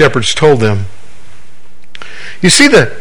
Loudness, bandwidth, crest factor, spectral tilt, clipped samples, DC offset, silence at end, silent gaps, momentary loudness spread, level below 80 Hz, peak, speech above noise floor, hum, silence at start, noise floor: -8 LUFS; over 20 kHz; 12 dB; -4 dB/octave; 2%; 10%; 0 s; none; 23 LU; -40 dBFS; 0 dBFS; 37 dB; none; 0 s; -46 dBFS